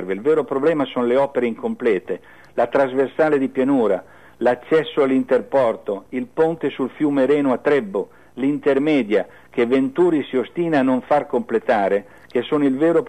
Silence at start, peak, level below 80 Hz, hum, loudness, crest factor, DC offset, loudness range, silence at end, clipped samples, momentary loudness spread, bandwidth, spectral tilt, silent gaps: 0 s; -8 dBFS; -62 dBFS; none; -20 LUFS; 12 dB; 0.3%; 1 LU; 0 s; under 0.1%; 8 LU; 9.2 kHz; -7.5 dB/octave; none